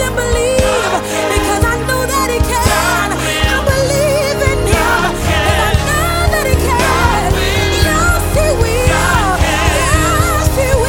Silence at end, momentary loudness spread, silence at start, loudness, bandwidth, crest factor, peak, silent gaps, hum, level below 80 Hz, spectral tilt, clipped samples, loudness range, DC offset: 0 s; 2 LU; 0 s; -13 LUFS; 18.5 kHz; 12 dB; 0 dBFS; none; none; -20 dBFS; -4 dB/octave; under 0.1%; 1 LU; under 0.1%